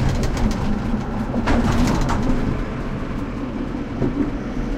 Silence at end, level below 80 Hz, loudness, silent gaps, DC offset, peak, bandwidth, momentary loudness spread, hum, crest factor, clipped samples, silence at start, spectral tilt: 0 s; -26 dBFS; -23 LUFS; none; under 0.1%; -6 dBFS; 13.5 kHz; 8 LU; none; 14 dB; under 0.1%; 0 s; -6.5 dB/octave